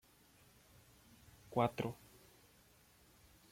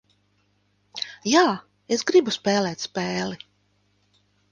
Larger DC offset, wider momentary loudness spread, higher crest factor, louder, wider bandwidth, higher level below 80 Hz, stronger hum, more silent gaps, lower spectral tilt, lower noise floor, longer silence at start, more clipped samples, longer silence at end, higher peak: neither; first, 28 LU vs 14 LU; first, 26 dB vs 20 dB; second, -40 LUFS vs -23 LUFS; first, 16.5 kHz vs 9.8 kHz; about the same, -72 dBFS vs -68 dBFS; second, none vs 50 Hz at -45 dBFS; neither; first, -6.5 dB/octave vs -4 dB/octave; about the same, -68 dBFS vs -67 dBFS; first, 1.5 s vs 0.95 s; neither; first, 1.55 s vs 1.15 s; second, -20 dBFS vs -4 dBFS